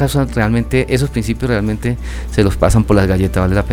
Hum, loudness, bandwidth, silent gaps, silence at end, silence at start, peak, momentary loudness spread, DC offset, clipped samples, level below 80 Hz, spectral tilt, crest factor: none; -15 LUFS; 16.5 kHz; none; 0 s; 0 s; 0 dBFS; 7 LU; under 0.1%; under 0.1%; -24 dBFS; -6.5 dB/octave; 14 dB